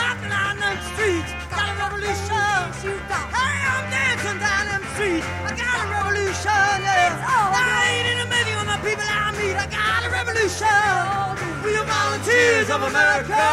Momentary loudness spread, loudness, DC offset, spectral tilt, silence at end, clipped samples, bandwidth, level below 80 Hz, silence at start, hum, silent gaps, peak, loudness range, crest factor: 7 LU; -20 LUFS; under 0.1%; -3 dB/octave; 0 s; under 0.1%; 16 kHz; -42 dBFS; 0 s; none; none; -6 dBFS; 3 LU; 16 dB